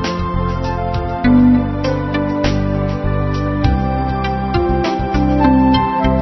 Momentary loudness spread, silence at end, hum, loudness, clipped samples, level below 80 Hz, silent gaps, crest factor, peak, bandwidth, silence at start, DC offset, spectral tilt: 8 LU; 0 s; none; -16 LUFS; under 0.1%; -24 dBFS; none; 14 dB; 0 dBFS; 6.2 kHz; 0 s; 0.2%; -8 dB/octave